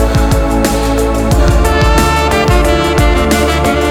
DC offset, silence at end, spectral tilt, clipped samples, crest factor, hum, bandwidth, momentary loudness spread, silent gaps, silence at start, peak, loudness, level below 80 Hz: under 0.1%; 0 s; -5.5 dB/octave; under 0.1%; 10 dB; none; 17.5 kHz; 2 LU; none; 0 s; 0 dBFS; -11 LUFS; -14 dBFS